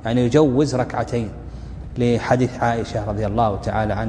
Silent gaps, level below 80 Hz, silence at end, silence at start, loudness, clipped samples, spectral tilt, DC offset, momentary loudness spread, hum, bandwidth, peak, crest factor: none; -36 dBFS; 0 s; 0 s; -20 LUFS; under 0.1%; -7 dB/octave; under 0.1%; 15 LU; none; 10 kHz; 0 dBFS; 20 dB